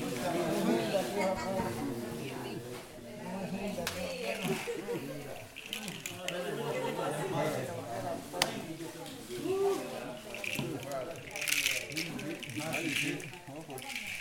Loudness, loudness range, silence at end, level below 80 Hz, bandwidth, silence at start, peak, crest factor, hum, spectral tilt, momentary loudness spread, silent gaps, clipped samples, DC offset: -36 LUFS; 4 LU; 0 s; -62 dBFS; 19 kHz; 0 s; -6 dBFS; 30 dB; none; -4 dB/octave; 11 LU; none; under 0.1%; under 0.1%